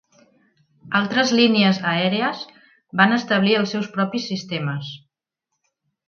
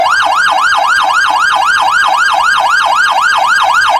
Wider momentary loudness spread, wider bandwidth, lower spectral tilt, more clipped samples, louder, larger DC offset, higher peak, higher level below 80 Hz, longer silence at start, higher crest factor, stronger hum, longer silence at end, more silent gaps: first, 14 LU vs 1 LU; second, 7.2 kHz vs 17 kHz; first, -5 dB/octave vs 0.5 dB/octave; neither; second, -20 LUFS vs -8 LUFS; neither; about the same, 0 dBFS vs 0 dBFS; second, -68 dBFS vs -48 dBFS; first, 0.85 s vs 0 s; first, 20 dB vs 10 dB; second, none vs 50 Hz at -50 dBFS; first, 1.1 s vs 0 s; neither